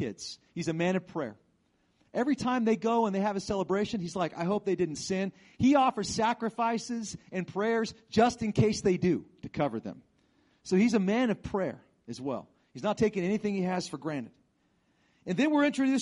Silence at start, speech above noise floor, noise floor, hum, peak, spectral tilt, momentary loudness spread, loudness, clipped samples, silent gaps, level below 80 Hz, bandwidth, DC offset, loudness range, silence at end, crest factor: 0 s; 42 dB; -71 dBFS; none; -12 dBFS; -6 dB/octave; 13 LU; -30 LUFS; under 0.1%; none; -60 dBFS; 11.5 kHz; under 0.1%; 3 LU; 0 s; 18 dB